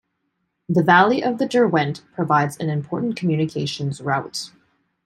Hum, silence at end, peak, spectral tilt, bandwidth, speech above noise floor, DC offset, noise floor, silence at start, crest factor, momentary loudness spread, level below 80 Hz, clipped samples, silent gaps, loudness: none; 0.6 s; -2 dBFS; -6 dB/octave; 13.5 kHz; 54 dB; under 0.1%; -73 dBFS; 0.7 s; 20 dB; 12 LU; -64 dBFS; under 0.1%; none; -20 LUFS